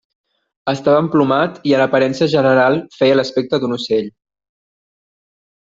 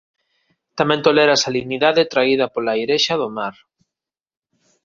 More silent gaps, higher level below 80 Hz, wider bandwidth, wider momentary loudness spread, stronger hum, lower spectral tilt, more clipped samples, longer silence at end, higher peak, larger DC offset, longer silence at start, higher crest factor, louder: neither; about the same, -58 dBFS vs -60 dBFS; about the same, 7.8 kHz vs 7.4 kHz; second, 7 LU vs 11 LU; neither; first, -6.5 dB/octave vs -3.5 dB/octave; neither; first, 1.55 s vs 1.35 s; about the same, -2 dBFS vs 0 dBFS; neither; about the same, 0.65 s vs 0.75 s; about the same, 16 dB vs 18 dB; about the same, -15 LUFS vs -17 LUFS